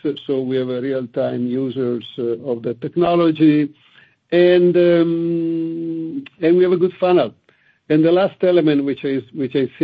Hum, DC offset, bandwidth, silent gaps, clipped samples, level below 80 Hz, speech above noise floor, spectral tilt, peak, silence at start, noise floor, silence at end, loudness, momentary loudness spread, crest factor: none; under 0.1%; 4.9 kHz; none; under 0.1%; -62 dBFS; 40 dB; -10 dB/octave; -2 dBFS; 0.05 s; -57 dBFS; 0 s; -18 LUFS; 10 LU; 16 dB